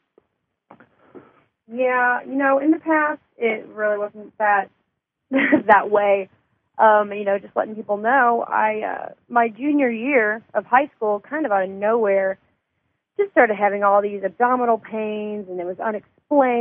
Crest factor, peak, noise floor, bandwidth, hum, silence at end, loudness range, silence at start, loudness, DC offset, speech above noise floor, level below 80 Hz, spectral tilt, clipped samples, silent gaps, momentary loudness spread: 20 dB; -2 dBFS; -75 dBFS; 3.6 kHz; none; 0 s; 3 LU; 1.15 s; -20 LUFS; under 0.1%; 55 dB; -72 dBFS; -8.5 dB/octave; under 0.1%; none; 11 LU